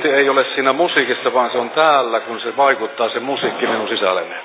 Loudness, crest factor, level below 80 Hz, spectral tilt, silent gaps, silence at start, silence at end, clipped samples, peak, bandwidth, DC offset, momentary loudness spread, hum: -17 LUFS; 16 dB; -76 dBFS; -7.5 dB/octave; none; 0 s; 0 s; under 0.1%; -2 dBFS; 4 kHz; under 0.1%; 7 LU; none